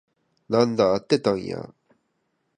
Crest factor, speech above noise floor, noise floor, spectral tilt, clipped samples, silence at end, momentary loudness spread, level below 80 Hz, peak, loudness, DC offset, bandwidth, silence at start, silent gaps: 20 dB; 51 dB; -73 dBFS; -6 dB/octave; under 0.1%; 0.9 s; 15 LU; -60 dBFS; -4 dBFS; -23 LUFS; under 0.1%; 10 kHz; 0.5 s; none